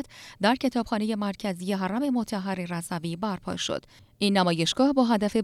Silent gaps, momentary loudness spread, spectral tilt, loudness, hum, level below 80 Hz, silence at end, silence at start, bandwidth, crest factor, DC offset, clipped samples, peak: none; 9 LU; -5 dB/octave; -27 LUFS; none; -58 dBFS; 0 s; 0 s; 14.5 kHz; 18 dB; under 0.1%; under 0.1%; -10 dBFS